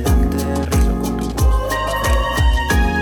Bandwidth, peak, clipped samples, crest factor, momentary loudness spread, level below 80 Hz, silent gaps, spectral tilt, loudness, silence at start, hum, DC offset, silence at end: 19.5 kHz; -6 dBFS; under 0.1%; 10 dB; 3 LU; -18 dBFS; none; -5.5 dB/octave; -18 LUFS; 0 s; none; under 0.1%; 0 s